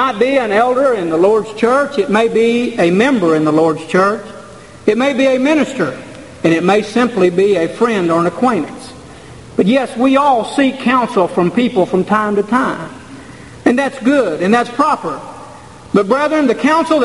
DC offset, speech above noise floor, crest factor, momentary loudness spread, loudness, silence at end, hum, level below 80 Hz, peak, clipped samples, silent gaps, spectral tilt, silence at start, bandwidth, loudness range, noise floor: 0.3%; 22 dB; 14 dB; 12 LU; -13 LUFS; 0 s; none; -50 dBFS; 0 dBFS; under 0.1%; none; -6 dB/octave; 0 s; 11.5 kHz; 3 LU; -35 dBFS